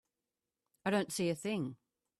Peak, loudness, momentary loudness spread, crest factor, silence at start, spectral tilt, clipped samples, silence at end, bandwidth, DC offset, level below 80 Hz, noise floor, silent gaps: -20 dBFS; -37 LUFS; 7 LU; 18 dB; 0.85 s; -5 dB/octave; under 0.1%; 0.45 s; 14 kHz; under 0.1%; -76 dBFS; under -90 dBFS; none